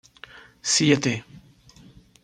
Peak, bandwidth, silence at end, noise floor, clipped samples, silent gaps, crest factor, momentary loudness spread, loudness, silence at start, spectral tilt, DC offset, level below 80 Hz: -4 dBFS; 11 kHz; 0.85 s; -51 dBFS; under 0.1%; none; 22 dB; 26 LU; -22 LUFS; 0.65 s; -3.5 dB/octave; under 0.1%; -60 dBFS